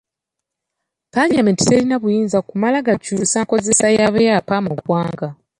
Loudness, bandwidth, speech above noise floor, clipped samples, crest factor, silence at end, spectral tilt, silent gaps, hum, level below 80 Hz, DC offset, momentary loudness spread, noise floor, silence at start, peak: -16 LUFS; 11.5 kHz; 66 dB; under 0.1%; 16 dB; 0.25 s; -4.5 dB/octave; none; none; -52 dBFS; under 0.1%; 6 LU; -82 dBFS; 1.15 s; -2 dBFS